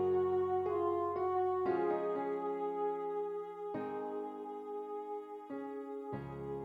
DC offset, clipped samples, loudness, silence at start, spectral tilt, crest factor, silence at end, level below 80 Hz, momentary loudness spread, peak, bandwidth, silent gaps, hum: under 0.1%; under 0.1%; -38 LUFS; 0 s; -9 dB/octave; 14 dB; 0 s; -72 dBFS; 10 LU; -24 dBFS; 5 kHz; none; none